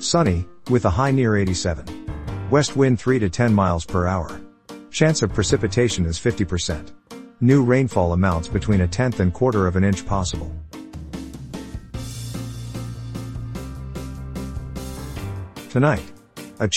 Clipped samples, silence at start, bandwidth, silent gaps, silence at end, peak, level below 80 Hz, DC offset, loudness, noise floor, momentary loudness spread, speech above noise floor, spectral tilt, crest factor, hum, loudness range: under 0.1%; 0 s; 15 kHz; none; 0 s; -2 dBFS; -36 dBFS; 0.5%; -21 LUFS; -41 dBFS; 16 LU; 21 dB; -6 dB/octave; 20 dB; none; 12 LU